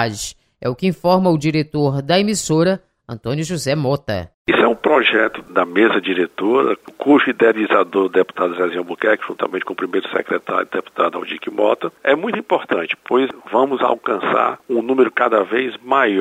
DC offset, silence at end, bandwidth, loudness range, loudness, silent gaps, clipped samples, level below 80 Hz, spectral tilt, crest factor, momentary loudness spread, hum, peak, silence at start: under 0.1%; 0 s; 16 kHz; 4 LU; -18 LUFS; 4.34-4.45 s; under 0.1%; -54 dBFS; -5 dB/octave; 16 dB; 8 LU; none; -2 dBFS; 0 s